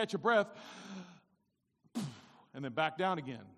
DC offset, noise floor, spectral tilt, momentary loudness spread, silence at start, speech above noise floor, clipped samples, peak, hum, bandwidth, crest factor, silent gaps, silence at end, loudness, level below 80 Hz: under 0.1%; -80 dBFS; -5.5 dB/octave; 19 LU; 0 s; 44 dB; under 0.1%; -18 dBFS; none; 13 kHz; 20 dB; none; 0.05 s; -36 LUFS; -82 dBFS